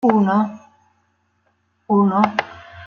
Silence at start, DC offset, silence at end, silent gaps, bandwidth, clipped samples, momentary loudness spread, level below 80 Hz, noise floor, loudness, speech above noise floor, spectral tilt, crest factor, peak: 0.05 s; under 0.1%; 0 s; none; 6.6 kHz; under 0.1%; 10 LU; -64 dBFS; -65 dBFS; -18 LUFS; 49 dB; -8 dB/octave; 18 dB; -2 dBFS